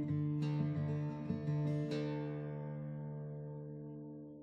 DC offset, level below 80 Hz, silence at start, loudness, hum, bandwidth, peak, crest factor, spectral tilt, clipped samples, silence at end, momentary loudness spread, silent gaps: under 0.1%; -70 dBFS; 0 s; -40 LUFS; none; 6.2 kHz; -24 dBFS; 14 dB; -9 dB/octave; under 0.1%; 0 s; 11 LU; none